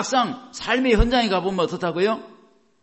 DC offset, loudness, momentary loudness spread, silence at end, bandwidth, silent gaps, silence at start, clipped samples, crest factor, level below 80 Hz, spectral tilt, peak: under 0.1%; -22 LUFS; 8 LU; 0.55 s; 8.4 kHz; none; 0 s; under 0.1%; 18 dB; -32 dBFS; -4.5 dB/octave; -4 dBFS